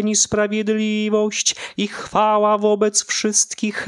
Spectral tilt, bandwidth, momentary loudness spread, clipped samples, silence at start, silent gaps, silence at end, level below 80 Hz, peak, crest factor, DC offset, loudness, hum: -2.5 dB/octave; 12 kHz; 5 LU; under 0.1%; 0 s; none; 0 s; -56 dBFS; -4 dBFS; 16 dB; under 0.1%; -18 LUFS; none